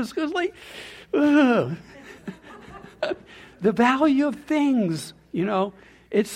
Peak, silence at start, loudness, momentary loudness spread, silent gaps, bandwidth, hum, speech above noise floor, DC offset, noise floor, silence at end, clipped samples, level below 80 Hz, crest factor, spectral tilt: -6 dBFS; 0 s; -23 LUFS; 21 LU; none; 13.5 kHz; none; 21 dB; under 0.1%; -44 dBFS; 0 s; under 0.1%; -60 dBFS; 18 dB; -6 dB/octave